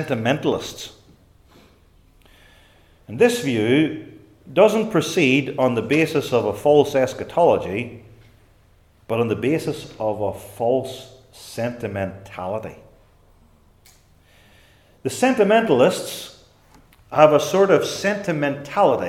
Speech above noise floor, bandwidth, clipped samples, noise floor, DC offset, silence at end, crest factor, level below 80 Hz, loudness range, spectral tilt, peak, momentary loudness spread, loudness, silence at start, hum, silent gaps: 35 dB; 16 kHz; under 0.1%; -55 dBFS; under 0.1%; 0 s; 22 dB; -56 dBFS; 10 LU; -5.5 dB/octave; 0 dBFS; 16 LU; -20 LUFS; 0 s; none; none